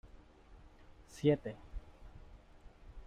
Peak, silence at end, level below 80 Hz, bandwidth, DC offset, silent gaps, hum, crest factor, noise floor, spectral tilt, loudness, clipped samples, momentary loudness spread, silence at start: -18 dBFS; 0.05 s; -56 dBFS; 13 kHz; under 0.1%; none; none; 24 dB; -59 dBFS; -7.5 dB/octave; -35 LUFS; under 0.1%; 26 LU; 0.05 s